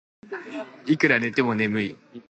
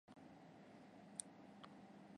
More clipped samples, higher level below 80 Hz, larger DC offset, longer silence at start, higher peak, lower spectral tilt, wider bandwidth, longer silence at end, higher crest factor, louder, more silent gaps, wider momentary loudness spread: neither; first, -66 dBFS vs -88 dBFS; neither; first, 0.25 s vs 0.05 s; first, -4 dBFS vs -28 dBFS; first, -6 dB/octave vs -3.5 dB/octave; second, 8.6 kHz vs 10.5 kHz; about the same, 0.1 s vs 0 s; second, 22 dB vs 32 dB; first, -23 LUFS vs -58 LUFS; neither; first, 17 LU vs 9 LU